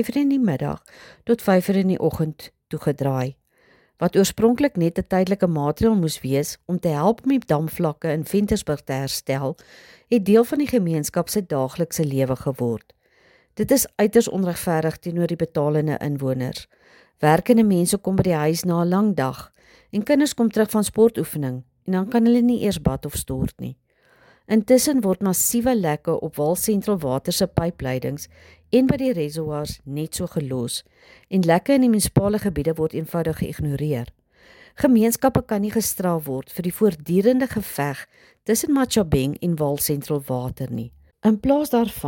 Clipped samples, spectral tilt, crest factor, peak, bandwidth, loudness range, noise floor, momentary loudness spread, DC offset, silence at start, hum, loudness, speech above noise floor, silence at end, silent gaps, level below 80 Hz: under 0.1%; -5.5 dB/octave; 18 dB; -4 dBFS; 17 kHz; 3 LU; -58 dBFS; 11 LU; under 0.1%; 0 s; none; -21 LUFS; 37 dB; 0 s; none; -46 dBFS